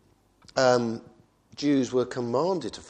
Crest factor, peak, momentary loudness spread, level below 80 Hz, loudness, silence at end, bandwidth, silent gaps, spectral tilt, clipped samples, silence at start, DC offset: 20 dB; -6 dBFS; 10 LU; -64 dBFS; -26 LUFS; 0 s; 9.6 kHz; none; -5 dB/octave; under 0.1%; 0.55 s; under 0.1%